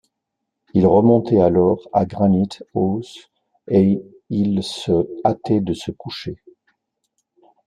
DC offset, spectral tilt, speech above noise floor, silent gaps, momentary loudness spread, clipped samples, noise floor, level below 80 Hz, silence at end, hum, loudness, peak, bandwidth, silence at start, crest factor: under 0.1%; -8 dB/octave; 61 dB; none; 15 LU; under 0.1%; -79 dBFS; -54 dBFS; 1.35 s; none; -18 LUFS; -2 dBFS; 10.5 kHz; 0.75 s; 18 dB